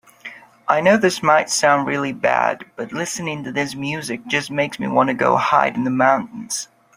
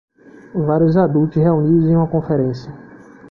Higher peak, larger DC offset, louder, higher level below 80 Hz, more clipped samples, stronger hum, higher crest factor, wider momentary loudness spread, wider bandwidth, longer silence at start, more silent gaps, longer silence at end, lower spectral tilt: about the same, 0 dBFS vs -2 dBFS; neither; second, -19 LUFS vs -16 LUFS; second, -62 dBFS vs -46 dBFS; neither; neither; about the same, 18 dB vs 14 dB; about the same, 11 LU vs 12 LU; first, 16 kHz vs 5.8 kHz; second, 0.25 s vs 0.55 s; neither; first, 0.35 s vs 0.05 s; second, -4 dB/octave vs -11 dB/octave